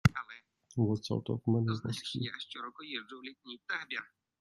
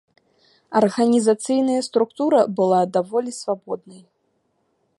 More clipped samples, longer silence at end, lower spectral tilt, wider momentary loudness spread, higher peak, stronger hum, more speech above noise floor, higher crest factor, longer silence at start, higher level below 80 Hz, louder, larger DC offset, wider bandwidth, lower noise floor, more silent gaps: neither; second, 0.35 s vs 1 s; about the same, -6 dB/octave vs -5.5 dB/octave; first, 16 LU vs 10 LU; second, -10 dBFS vs -4 dBFS; neither; second, 20 dB vs 49 dB; first, 26 dB vs 18 dB; second, 0.05 s vs 0.7 s; first, -60 dBFS vs -72 dBFS; second, -36 LUFS vs -20 LUFS; neither; about the same, 12 kHz vs 11.5 kHz; second, -56 dBFS vs -69 dBFS; neither